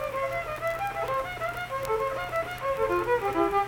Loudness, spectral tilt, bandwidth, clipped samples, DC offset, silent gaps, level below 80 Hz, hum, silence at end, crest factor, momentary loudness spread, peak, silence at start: -29 LUFS; -5 dB/octave; 19 kHz; under 0.1%; under 0.1%; none; -50 dBFS; none; 0 s; 16 dB; 6 LU; -12 dBFS; 0 s